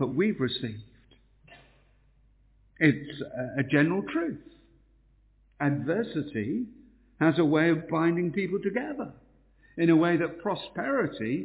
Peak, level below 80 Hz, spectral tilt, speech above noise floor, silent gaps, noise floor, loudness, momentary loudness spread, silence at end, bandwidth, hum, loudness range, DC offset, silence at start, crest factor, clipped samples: -8 dBFS; -62 dBFS; -6 dB/octave; 35 dB; none; -62 dBFS; -28 LUFS; 13 LU; 0 s; 4 kHz; none; 5 LU; under 0.1%; 0 s; 20 dB; under 0.1%